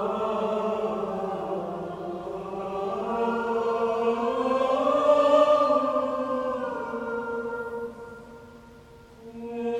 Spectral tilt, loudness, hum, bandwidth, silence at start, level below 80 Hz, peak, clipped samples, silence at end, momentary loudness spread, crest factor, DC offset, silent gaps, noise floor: -6 dB/octave; -26 LUFS; none; 10.5 kHz; 0 s; -60 dBFS; -8 dBFS; under 0.1%; 0 s; 15 LU; 18 dB; under 0.1%; none; -49 dBFS